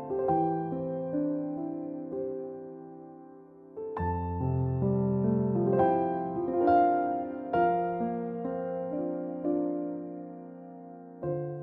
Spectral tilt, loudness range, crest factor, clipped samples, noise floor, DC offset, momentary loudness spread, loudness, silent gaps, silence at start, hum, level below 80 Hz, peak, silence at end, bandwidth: -12 dB/octave; 9 LU; 18 dB; under 0.1%; -51 dBFS; under 0.1%; 19 LU; -30 LUFS; none; 0 s; none; -50 dBFS; -12 dBFS; 0 s; 4.5 kHz